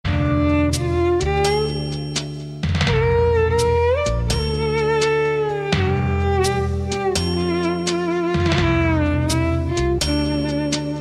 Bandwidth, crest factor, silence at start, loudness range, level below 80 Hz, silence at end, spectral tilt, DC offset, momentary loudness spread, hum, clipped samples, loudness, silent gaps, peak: 13.5 kHz; 14 dB; 0.05 s; 1 LU; -30 dBFS; 0 s; -5.5 dB/octave; under 0.1%; 5 LU; none; under 0.1%; -20 LUFS; none; -4 dBFS